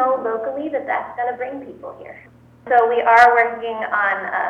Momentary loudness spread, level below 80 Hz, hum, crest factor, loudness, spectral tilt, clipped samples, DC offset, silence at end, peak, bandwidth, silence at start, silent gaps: 22 LU; -60 dBFS; none; 16 dB; -17 LUFS; -4.5 dB/octave; under 0.1%; under 0.1%; 0 s; -2 dBFS; 9 kHz; 0 s; none